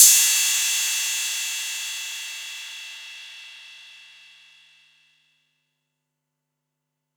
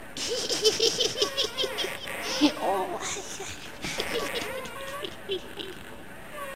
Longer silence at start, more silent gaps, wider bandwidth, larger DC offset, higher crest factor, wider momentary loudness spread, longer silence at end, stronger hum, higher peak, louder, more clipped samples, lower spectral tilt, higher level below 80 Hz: about the same, 0 s vs 0 s; neither; first, over 20 kHz vs 16 kHz; second, under 0.1% vs 0.6%; about the same, 26 dB vs 24 dB; first, 24 LU vs 15 LU; first, 3.2 s vs 0 s; neither; first, 0 dBFS vs -6 dBFS; first, -20 LUFS vs -28 LUFS; neither; second, 8 dB/octave vs -2 dB/octave; second, under -90 dBFS vs -56 dBFS